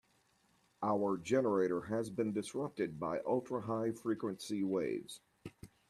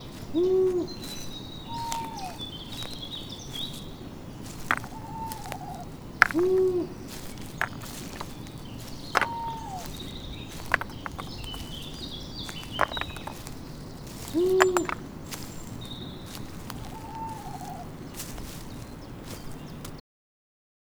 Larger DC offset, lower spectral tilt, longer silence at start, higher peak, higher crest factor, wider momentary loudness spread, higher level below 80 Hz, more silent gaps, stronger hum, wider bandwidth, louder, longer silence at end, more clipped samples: neither; first, -6 dB/octave vs -4.5 dB/octave; first, 0.8 s vs 0 s; second, -20 dBFS vs 0 dBFS; second, 18 dB vs 32 dB; second, 11 LU vs 17 LU; second, -74 dBFS vs -48 dBFS; neither; neither; second, 13.5 kHz vs over 20 kHz; second, -37 LUFS vs -31 LUFS; second, 0.25 s vs 1 s; neither